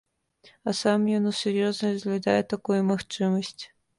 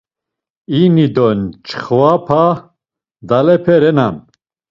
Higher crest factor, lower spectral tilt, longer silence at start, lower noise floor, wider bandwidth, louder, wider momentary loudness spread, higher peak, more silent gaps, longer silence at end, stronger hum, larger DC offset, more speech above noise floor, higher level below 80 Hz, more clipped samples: about the same, 16 dB vs 14 dB; second, -5.5 dB/octave vs -9 dB/octave; about the same, 0.65 s vs 0.7 s; second, -59 dBFS vs -82 dBFS; first, 11.5 kHz vs 7.2 kHz; second, -26 LUFS vs -13 LUFS; second, 7 LU vs 11 LU; second, -10 dBFS vs 0 dBFS; neither; second, 0.35 s vs 0.5 s; neither; neither; second, 34 dB vs 71 dB; second, -66 dBFS vs -50 dBFS; neither